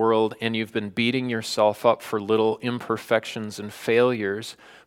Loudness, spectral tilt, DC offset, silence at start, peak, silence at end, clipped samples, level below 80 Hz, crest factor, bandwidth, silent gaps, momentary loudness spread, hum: -24 LUFS; -5 dB/octave; under 0.1%; 0 s; -4 dBFS; 0.15 s; under 0.1%; -70 dBFS; 20 dB; 16.5 kHz; none; 11 LU; none